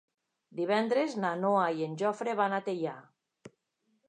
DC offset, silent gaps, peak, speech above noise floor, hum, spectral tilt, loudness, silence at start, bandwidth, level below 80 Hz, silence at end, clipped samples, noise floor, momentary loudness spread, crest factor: under 0.1%; none; -14 dBFS; 47 dB; none; -6 dB/octave; -31 LUFS; 0.55 s; 10 kHz; -86 dBFS; 0.6 s; under 0.1%; -77 dBFS; 9 LU; 18 dB